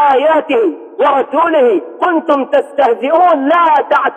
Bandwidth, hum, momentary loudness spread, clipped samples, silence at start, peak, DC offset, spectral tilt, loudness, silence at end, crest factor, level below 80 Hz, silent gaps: 9.2 kHz; none; 5 LU; under 0.1%; 0 s; -2 dBFS; under 0.1%; -5 dB/octave; -12 LUFS; 0 s; 10 dB; -62 dBFS; none